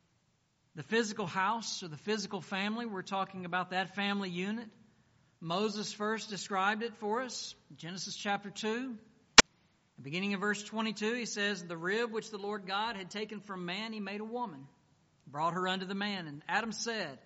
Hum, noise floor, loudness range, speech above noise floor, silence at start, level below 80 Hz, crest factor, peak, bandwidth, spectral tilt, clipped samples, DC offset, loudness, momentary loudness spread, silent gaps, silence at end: none; -74 dBFS; 9 LU; 38 dB; 0.75 s; -62 dBFS; 34 dB; 0 dBFS; 8 kHz; -1.5 dB/octave; under 0.1%; under 0.1%; -33 LUFS; 9 LU; none; 0.05 s